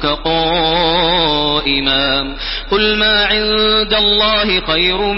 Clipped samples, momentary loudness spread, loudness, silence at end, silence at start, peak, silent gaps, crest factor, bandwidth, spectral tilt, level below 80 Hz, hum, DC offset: under 0.1%; 5 LU; -12 LUFS; 0 s; 0 s; 0 dBFS; none; 14 dB; 5.8 kHz; -8 dB/octave; -30 dBFS; none; under 0.1%